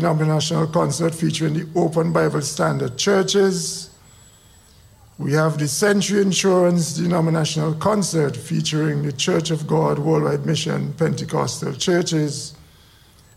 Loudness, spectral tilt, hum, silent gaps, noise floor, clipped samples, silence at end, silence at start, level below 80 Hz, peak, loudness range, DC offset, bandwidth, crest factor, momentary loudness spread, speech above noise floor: -20 LUFS; -5 dB/octave; none; none; -50 dBFS; under 0.1%; 0.8 s; 0 s; -54 dBFS; -6 dBFS; 3 LU; under 0.1%; 14.5 kHz; 14 dB; 6 LU; 31 dB